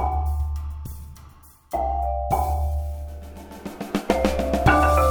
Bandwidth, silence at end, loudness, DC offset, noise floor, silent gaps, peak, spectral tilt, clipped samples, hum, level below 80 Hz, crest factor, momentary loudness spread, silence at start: over 20 kHz; 0 s; -23 LUFS; under 0.1%; -48 dBFS; none; -4 dBFS; -6.5 dB/octave; under 0.1%; none; -28 dBFS; 20 dB; 20 LU; 0 s